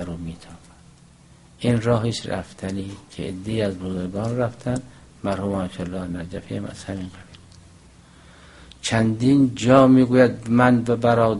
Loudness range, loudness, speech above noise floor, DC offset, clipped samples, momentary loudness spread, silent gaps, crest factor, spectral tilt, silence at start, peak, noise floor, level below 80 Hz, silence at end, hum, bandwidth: 12 LU; -21 LUFS; 30 dB; under 0.1%; under 0.1%; 17 LU; none; 22 dB; -6.5 dB/octave; 0 s; 0 dBFS; -50 dBFS; -48 dBFS; 0 s; none; 11.5 kHz